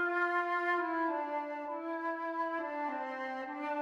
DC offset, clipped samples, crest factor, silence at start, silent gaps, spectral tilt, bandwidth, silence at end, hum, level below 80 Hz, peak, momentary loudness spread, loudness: under 0.1%; under 0.1%; 14 dB; 0 s; none; -4 dB/octave; 7.8 kHz; 0 s; none; -82 dBFS; -20 dBFS; 8 LU; -35 LUFS